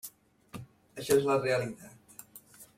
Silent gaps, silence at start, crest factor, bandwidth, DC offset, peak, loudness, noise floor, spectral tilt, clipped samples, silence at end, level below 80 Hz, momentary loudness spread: none; 0.05 s; 20 dB; 16.5 kHz; under 0.1%; -14 dBFS; -29 LUFS; -55 dBFS; -4.5 dB/octave; under 0.1%; 0.15 s; -68 dBFS; 24 LU